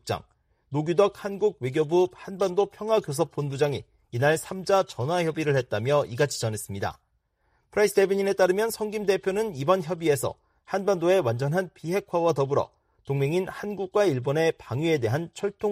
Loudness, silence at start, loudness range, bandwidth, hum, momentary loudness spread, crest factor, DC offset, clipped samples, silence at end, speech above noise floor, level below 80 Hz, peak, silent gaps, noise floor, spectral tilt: -26 LUFS; 0.05 s; 2 LU; 15.5 kHz; none; 9 LU; 18 dB; under 0.1%; under 0.1%; 0 s; 46 dB; -62 dBFS; -6 dBFS; none; -71 dBFS; -5.5 dB/octave